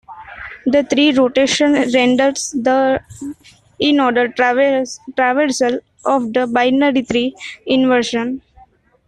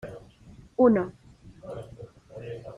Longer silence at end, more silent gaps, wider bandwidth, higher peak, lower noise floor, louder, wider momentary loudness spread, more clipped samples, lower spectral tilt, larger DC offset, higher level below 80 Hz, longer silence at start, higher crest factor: first, 0.7 s vs 0 s; neither; about the same, 11 kHz vs 10 kHz; first, -2 dBFS vs -8 dBFS; about the same, -49 dBFS vs -51 dBFS; first, -15 LUFS vs -24 LUFS; second, 11 LU vs 25 LU; neither; second, -3.5 dB/octave vs -9 dB/octave; neither; about the same, -54 dBFS vs -58 dBFS; about the same, 0.1 s vs 0.05 s; second, 14 dB vs 20 dB